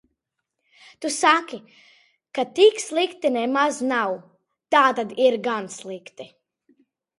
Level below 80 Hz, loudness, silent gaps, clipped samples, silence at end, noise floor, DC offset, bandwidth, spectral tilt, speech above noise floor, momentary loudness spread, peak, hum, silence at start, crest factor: -76 dBFS; -21 LUFS; none; under 0.1%; 0.95 s; -80 dBFS; under 0.1%; 11.5 kHz; -2.5 dB/octave; 59 dB; 19 LU; -2 dBFS; none; 1 s; 22 dB